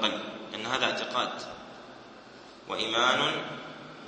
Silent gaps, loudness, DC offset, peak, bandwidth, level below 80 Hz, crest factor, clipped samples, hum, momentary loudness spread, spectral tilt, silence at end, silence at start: none; -29 LUFS; under 0.1%; -8 dBFS; 8.8 kHz; -70 dBFS; 24 dB; under 0.1%; none; 23 LU; -2.5 dB/octave; 0 s; 0 s